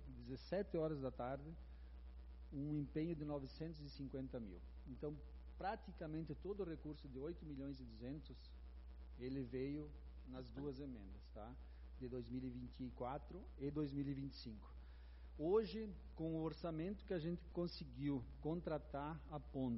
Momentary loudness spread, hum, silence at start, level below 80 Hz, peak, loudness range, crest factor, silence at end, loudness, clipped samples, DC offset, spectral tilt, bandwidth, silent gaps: 14 LU; none; 0 s; -58 dBFS; -28 dBFS; 6 LU; 20 dB; 0 s; -48 LUFS; under 0.1%; under 0.1%; -7 dB/octave; 5.8 kHz; none